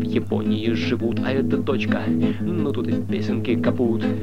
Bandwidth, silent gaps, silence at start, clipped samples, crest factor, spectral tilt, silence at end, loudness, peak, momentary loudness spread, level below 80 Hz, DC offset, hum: 8.8 kHz; none; 0 s; under 0.1%; 14 dB; -8 dB/octave; 0 s; -22 LUFS; -8 dBFS; 3 LU; -50 dBFS; 2%; none